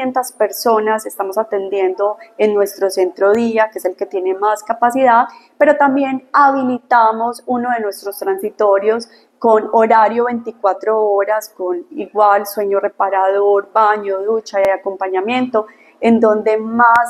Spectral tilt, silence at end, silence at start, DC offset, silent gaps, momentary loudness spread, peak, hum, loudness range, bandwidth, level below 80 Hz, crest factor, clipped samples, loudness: -4.5 dB/octave; 0 s; 0 s; under 0.1%; none; 9 LU; 0 dBFS; none; 3 LU; 14 kHz; -66 dBFS; 14 dB; under 0.1%; -15 LUFS